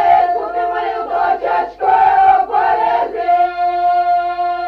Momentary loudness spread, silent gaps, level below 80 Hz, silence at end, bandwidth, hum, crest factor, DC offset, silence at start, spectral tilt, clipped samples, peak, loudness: 7 LU; none; -48 dBFS; 0 s; 5.4 kHz; 50 Hz at -50 dBFS; 12 dB; under 0.1%; 0 s; -5.5 dB/octave; under 0.1%; -2 dBFS; -14 LUFS